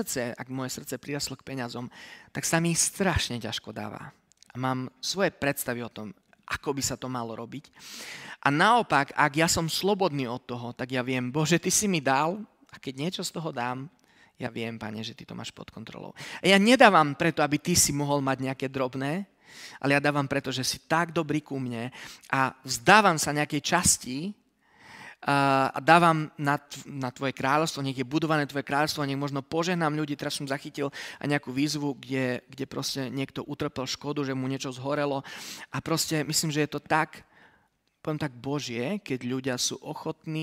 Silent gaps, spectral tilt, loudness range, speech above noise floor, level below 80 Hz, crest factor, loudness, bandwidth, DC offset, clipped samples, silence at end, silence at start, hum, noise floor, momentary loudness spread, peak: none; -3.5 dB/octave; 8 LU; 41 dB; -56 dBFS; 26 dB; -27 LUFS; 16 kHz; under 0.1%; under 0.1%; 0 s; 0 s; none; -68 dBFS; 17 LU; -2 dBFS